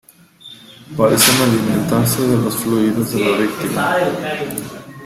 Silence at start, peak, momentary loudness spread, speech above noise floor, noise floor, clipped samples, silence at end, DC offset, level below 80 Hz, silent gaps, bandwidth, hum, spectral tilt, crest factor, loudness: 0.45 s; 0 dBFS; 14 LU; 26 dB; -42 dBFS; under 0.1%; 0 s; under 0.1%; -50 dBFS; none; 16.5 kHz; none; -4 dB/octave; 16 dB; -16 LUFS